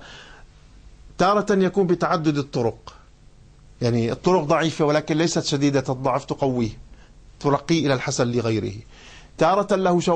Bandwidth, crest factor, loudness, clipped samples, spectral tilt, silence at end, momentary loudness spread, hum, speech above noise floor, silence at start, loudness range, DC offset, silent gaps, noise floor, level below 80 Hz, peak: 9.6 kHz; 16 dB; -22 LUFS; under 0.1%; -5.5 dB/octave; 0 s; 7 LU; none; 28 dB; 0 s; 2 LU; under 0.1%; none; -49 dBFS; -48 dBFS; -6 dBFS